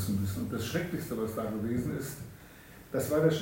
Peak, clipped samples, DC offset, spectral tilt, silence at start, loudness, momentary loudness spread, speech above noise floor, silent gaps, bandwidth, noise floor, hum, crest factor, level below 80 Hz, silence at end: -12 dBFS; under 0.1%; under 0.1%; -6 dB/octave; 0 s; -33 LUFS; 18 LU; 20 dB; none; 16.5 kHz; -52 dBFS; none; 20 dB; -56 dBFS; 0 s